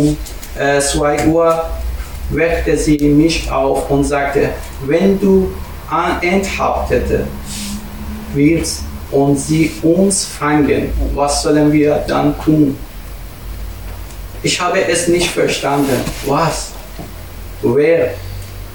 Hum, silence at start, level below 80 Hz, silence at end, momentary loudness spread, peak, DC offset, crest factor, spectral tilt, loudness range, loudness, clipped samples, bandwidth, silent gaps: none; 0 s; -28 dBFS; 0 s; 17 LU; 0 dBFS; 1%; 14 dB; -5 dB/octave; 3 LU; -15 LUFS; under 0.1%; 17.5 kHz; none